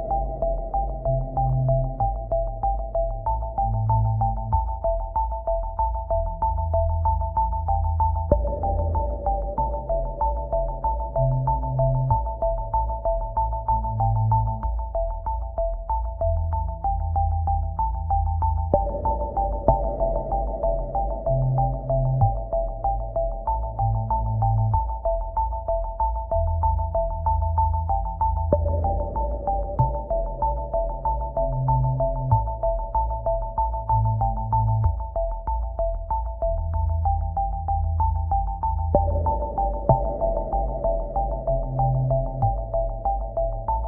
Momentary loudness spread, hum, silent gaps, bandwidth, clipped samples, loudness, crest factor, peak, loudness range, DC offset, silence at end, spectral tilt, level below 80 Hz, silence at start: 5 LU; none; none; 1.7 kHz; under 0.1%; -25 LUFS; 20 dB; -4 dBFS; 1 LU; under 0.1%; 0 s; -14.5 dB/octave; -28 dBFS; 0 s